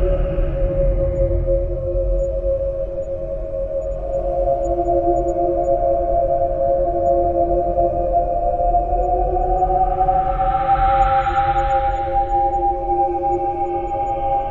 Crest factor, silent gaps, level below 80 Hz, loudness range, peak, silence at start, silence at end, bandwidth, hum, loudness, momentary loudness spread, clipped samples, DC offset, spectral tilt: 14 dB; none; -26 dBFS; 4 LU; -4 dBFS; 0 s; 0 s; 7.4 kHz; none; -19 LUFS; 6 LU; under 0.1%; under 0.1%; -9 dB/octave